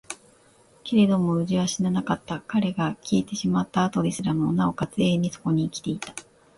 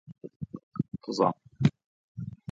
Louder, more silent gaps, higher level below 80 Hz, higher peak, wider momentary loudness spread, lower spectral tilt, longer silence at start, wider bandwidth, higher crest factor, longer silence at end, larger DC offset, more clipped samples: first, -25 LUFS vs -31 LUFS; second, none vs 0.36-0.40 s, 0.63-0.72 s, 1.86-2.15 s; about the same, -56 dBFS vs -60 dBFS; about the same, -8 dBFS vs -8 dBFS; second, 10 LU vs 15 LU; second, -6 dB/octave vs -7.5 dB/octave; about the same, 0.1 s vs 0.1 s; first, 11.5 kHz vs 7.6 kHz; second, 16 dB vs 24 dB; first, 0.35 s vs 0.2 s; neither; neither